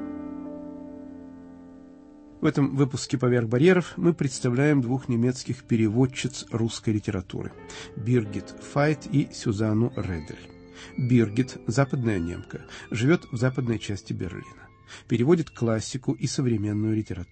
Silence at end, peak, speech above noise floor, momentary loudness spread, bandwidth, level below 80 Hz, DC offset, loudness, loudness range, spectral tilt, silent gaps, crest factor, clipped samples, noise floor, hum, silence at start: 0.05 s; -8 dBFS; 23 dB; 18 LU; 8.8 kHz; -54 dBFS; under 0.1%; -26 LUFS; 4 LU; -6.5 dB/octave; none; 18 dB; under 0.1%; -48 dBFS; none; 0 s